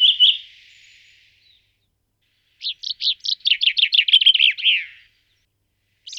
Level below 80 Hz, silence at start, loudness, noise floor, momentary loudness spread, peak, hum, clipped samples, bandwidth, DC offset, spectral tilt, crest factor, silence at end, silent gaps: -72 dBFS; 0 s; -15 LUFS; -70 dBFS; 16 LU; -4 dBFS; none; under 0.1%; 11 kHz; under 0.1%; 5.5 dB/octave; 18 dB; 0 s; none